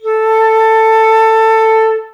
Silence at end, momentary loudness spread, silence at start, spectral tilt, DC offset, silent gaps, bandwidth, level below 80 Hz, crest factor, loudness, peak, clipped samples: 0.05 s; 3 LU; 0.05 s; -0.5 dB/octave; under 0.1%; none; 11.5 kHz; -72 dBFS; 10 dB; -9 LUFS; 0 dBFS; under 0.1%